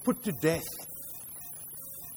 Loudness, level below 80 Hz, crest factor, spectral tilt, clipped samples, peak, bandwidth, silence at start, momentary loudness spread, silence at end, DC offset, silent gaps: -34 LUFS; -60 dBFS; 22 dB; -5 dB/octave; under 0.1%; -12 dBFS; over 20 kHz; 0 s; 10 LU; 0 s; under 0.1%; none